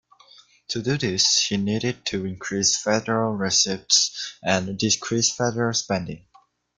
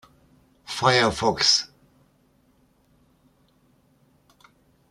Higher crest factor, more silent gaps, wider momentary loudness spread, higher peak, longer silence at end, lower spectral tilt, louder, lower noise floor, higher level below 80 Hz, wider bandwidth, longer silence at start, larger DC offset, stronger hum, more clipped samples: about the same, 20 dB vs 24 dB; neither; second, 10 LU vs 14 LU; about the same, -4 dBFS vs -4 dBFS; second, 0.6 s vs 3.25 s; about the same, -2.5 dB/octave vs -2.5 dB/octave; about the same, -22 LUFS vs -20 LUFS; second, -53 dBFS vs -63 dBFS; about the same, -58 dBFS vs -56 dBFS; second, 11 kHz vs 14.5 kHz; about the same, 0.7 s vs 0.7 s; neither; neither; neither